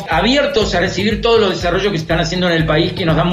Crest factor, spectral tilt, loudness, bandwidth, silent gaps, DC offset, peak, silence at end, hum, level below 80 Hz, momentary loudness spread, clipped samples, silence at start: 12 dB; -5.5 dB/octave; -15 LUFS; 13.5 kHz; none; under 0.1%; -2 dBFS; 0 s; none; -30 dBFS; 3 LU; under 0.1%; 0 s